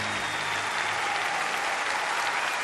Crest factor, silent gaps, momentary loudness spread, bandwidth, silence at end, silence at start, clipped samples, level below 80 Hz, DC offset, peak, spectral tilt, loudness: 16 dB; none; 1 LU; 13.5 kHz; 0 s; 0 s; under 0.1%; -64 dBFS; under 0.1%; -14 dBFS; -1 dB/octave; -27 LUFS